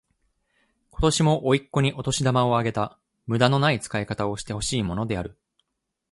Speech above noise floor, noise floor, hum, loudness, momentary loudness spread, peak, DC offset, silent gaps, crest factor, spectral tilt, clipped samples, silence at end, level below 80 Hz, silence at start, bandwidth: 57 dB; -80 dBFS; none; -24 LUFS; 9 LU; -2 dBFS; under 0.1%; none; 22 dB; -5 dB/octave; under 0.1%; 0.8 s; -44 dBFS; 0.95 s; 11.5 kHz